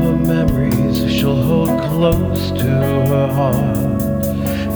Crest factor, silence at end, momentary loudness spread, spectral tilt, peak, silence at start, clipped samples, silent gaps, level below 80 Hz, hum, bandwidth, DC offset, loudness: 14 dB; 0 s; 3 LU; -7 dB/octave; -2 dBFS; 0 s; under 0.1%; none; -30 dBFS; none; over 20 kHz; under 0.1%; -16 LUFS